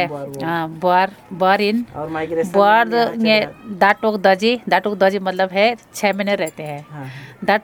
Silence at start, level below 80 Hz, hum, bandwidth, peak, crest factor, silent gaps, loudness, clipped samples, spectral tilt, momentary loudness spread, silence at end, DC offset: 0 s; -58 dBFS; none; 19 kHz; 0 dBFS; 18 dB; none; -17 LUFS; under 0.1%; -5 dB/octave; 11 LU; 0.05 s; under 0.1%